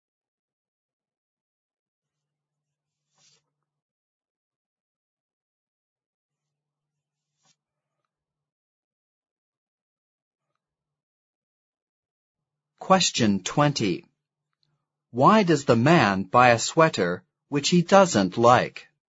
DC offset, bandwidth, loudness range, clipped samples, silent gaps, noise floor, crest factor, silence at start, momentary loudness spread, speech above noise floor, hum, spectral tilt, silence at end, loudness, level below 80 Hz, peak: under 0.1%; 8 kHz; 7 LU; under 0.1%; none; -87 dBFS; 24 dB; 12.8 s; 11 LU; 67 dB; none; -5 dB/octave; 0.5 s; -20 LUFS; -64 dBFS; -2 dBFS